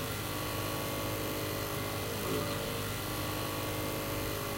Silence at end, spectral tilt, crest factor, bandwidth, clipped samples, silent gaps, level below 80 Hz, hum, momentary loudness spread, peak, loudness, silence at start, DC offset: 0 s; -4 dB/octave; 14 dB; 16 kHz; under 0.1%; none; -50 dBFS; none; 2 LU; -22 dBFS; -35 LUFS; 0 s; under 0.1%